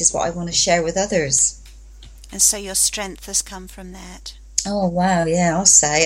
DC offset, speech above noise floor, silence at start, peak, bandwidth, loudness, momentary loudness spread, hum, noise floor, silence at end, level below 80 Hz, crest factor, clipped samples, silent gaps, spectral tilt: under 0.1%; 21 dB; 0 s; 0 dBFS; 16.5 kHz; -17 LUFS; 22 LU; none; -40 dBFS; 0 s; -40 dBFS; 20 dB; under 0.1%; none; -2.5 dB/octave